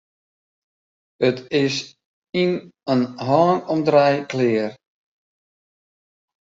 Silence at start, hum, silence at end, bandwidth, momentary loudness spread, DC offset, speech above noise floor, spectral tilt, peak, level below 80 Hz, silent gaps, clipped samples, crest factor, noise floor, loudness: 1.2 s; none; 1.75 s; 7.8 kHz; 11 LU; under 0.1%; over 71 dB; -6 dB/octave; -2 dBFS; -66 dBFS; 2.05-2.22 s, 2.29-2.33 s; under 0.1%; 20 dB; under -90 dBFS; -20 LUFS